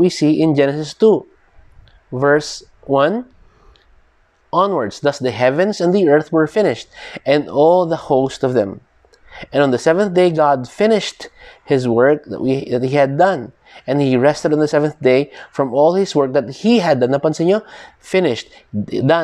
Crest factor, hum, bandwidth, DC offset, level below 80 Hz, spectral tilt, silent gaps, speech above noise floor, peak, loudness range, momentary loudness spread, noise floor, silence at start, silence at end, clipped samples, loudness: 14 dB; none; 11 kHz; under 0.1%; -54 dBFS; -6 dB/octave; none; 40 dB; -2 dBFS; 3 LU; 12 LU; -55 dBFS; 0 s; 0 s; under 0.1%; -16 LUFS